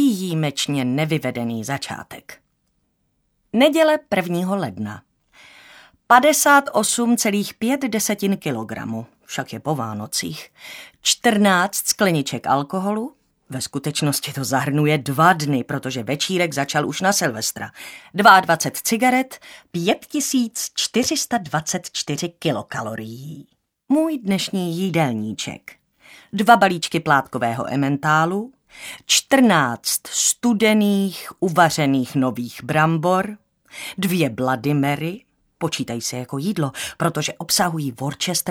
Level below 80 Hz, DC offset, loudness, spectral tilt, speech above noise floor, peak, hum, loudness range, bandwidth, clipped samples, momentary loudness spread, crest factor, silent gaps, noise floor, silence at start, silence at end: -62 dBFS; under 0.1%; -20 LUFS; -4 dB/octave; 49 dB; 0 dBFS; none; 6 LU; 18 kHz; under 0.1%; 15 LU; 20 dB; none; -69 dBFS; 0 s; 0 s